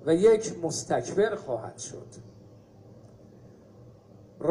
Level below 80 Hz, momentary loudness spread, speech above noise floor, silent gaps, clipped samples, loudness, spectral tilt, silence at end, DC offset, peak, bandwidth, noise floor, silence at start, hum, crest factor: -62 dBFS; 22 LU; 26 dB; none; under 0.1%; -27 LUFS; -5 dB/octave; 0 s; under 0.1%; -10 dBFS; 11.5 kHz; -52 dBFS; 0 s; none; 20 dB